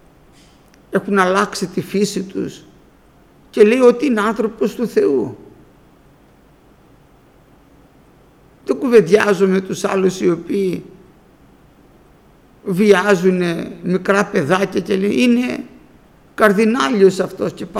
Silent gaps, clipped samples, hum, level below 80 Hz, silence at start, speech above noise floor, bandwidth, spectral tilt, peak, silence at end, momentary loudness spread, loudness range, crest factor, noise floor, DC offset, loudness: none; under 0.1%; none; -54 dBFS; 0.9 s; 34 dB; 15 kHz; -5.5 dB/octave; 0 dBFS; 0 s; 12 LU; 6 LU; 18 dB; -49 dBFS; under 0.1%; -16 LUFS